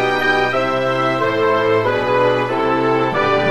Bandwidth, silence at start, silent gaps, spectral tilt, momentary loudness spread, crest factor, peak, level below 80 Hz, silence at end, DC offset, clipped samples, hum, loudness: 13.5 kHz; 0 s; none; -6 dB/octave; 2 LU; 12 dB; -4 dBFS; -50 dBFS; 0 s; 0.8%; under 0.1%; none; -16 LUFS